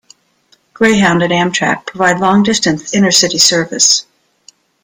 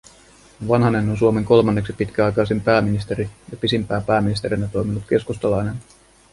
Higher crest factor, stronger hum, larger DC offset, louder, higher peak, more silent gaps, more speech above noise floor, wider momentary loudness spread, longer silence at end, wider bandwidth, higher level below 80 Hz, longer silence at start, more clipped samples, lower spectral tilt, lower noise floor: about the same, 14 dB vs 18 dB; neither; neither; first, -11 LUFS vs -20 LUFS; about the same, 0 dBFS vs -2 dBFS; neither; first, 43 dB vs 30 dB; second, 5 LU vs 10 LU; first, 0.8 s vs 0.5 s; first, 20 kHz vs 11.5 kHz; second, -50 dBFS vs -42 dBFS; first, 0.8 s vs 0.6 s; neither; second, -3 dB/octave vs -7 dB/octave; first, -54 dBFS vs -49 dBFS